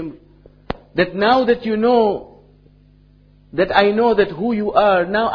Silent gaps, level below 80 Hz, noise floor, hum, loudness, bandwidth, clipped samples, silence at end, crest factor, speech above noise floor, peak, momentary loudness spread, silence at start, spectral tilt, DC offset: none; -46 dBFS; -50 dBFS; 50 Hz at -50 dBFS; -16 LUFS; 5.4 kHz; under 0.1%; 0 s; 18 dB; 34 dB; 0 dBFS; 14 LU; 0 s; -7.5 dB/octave; under 0.1%